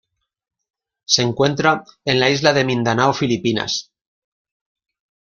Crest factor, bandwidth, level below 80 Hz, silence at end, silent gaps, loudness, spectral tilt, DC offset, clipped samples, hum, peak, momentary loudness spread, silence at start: 20 dB; 7.4 kHz; -56 dBFS; 1.45 s; none; -17 LUFS; -4 dB/octave; under 0.1%; under 0.1%; none; 0 dBFS; 6 LU; 1.1 s